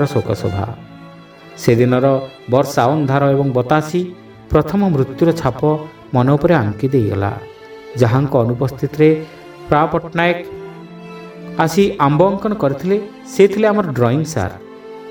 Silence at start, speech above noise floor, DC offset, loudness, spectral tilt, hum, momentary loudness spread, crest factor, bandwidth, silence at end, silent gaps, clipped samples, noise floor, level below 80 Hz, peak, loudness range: 0 s; 24 dB; under 0.1%; -16 LUFS; -7 dB/octave; none; 19 LU; 16 dB; 19.5 kHz; 0 s; none; under 0.1%; -38 dBFS; -42 dBFS; 0 dBFS; 2 LU